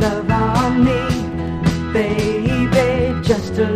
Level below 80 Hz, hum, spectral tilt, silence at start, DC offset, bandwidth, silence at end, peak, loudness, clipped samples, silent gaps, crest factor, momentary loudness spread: -30 dBFS; none; -6.5 dB/octave; 0 s; under 0.1%; 14.5 kHz; 0 s; -2 dBFS; -17 LUFS; under 0.1%; none; 16 dB; 4 LU